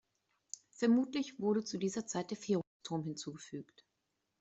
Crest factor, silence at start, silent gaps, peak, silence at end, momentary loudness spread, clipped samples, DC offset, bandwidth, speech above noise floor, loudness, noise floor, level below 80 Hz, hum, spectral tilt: 18 dB; 0.8 s; 2.67-2.80 s; -20 dBFS; 0.8 s; 17 LU; under 0.1%; under 0.1%; 8.2 kHz; 49 dB; -37 LUFS; -85 dBFS; -78 dBFS; none; -5 dB/octave